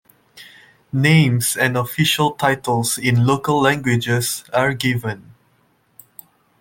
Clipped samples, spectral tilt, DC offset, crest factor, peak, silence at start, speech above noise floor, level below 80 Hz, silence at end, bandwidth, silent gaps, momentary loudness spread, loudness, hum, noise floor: under 0.1%; -4.5 dB/octave; under 0.1%; 16 dB; -2 dBFS; 0.35 s; 43 dB; -54 dBFS; 1.4 s; 17 kHz; none; 6 LU; -18 LUFS; none; -60 dBFS